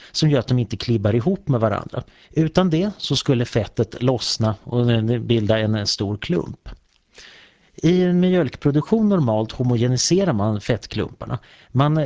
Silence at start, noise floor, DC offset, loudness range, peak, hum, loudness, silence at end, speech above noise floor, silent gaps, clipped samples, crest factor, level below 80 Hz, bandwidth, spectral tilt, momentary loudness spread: 0 s; -49 dBFS; under 0.1%; 3 LU; -4 dBFS; none; -20 LUFS; 0 s; 30 dB; none; under 0.1%; 16 dB; -44 dBFS; 8 kHz; -6 dB/octave; 9 LU